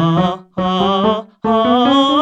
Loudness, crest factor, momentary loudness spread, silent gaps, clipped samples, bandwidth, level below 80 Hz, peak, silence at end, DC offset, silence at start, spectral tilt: -15 LUFS; 12 dB; 8 LU; none; under 0.1%; 8.4 kHz; -46 dBFS; -2 dBFS; 0 s; under 0.1%; 0 s; -7 dB/octave